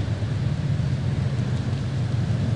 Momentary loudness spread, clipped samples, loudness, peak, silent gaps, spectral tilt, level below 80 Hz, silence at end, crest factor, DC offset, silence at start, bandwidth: 2 LU; under 0.1%; -25 LUFS; -14 dBFS; none; -7.5 dB/octave; -40 dBFS; 0 s; 10 dB; 0.4%; 0 s; 10 kHz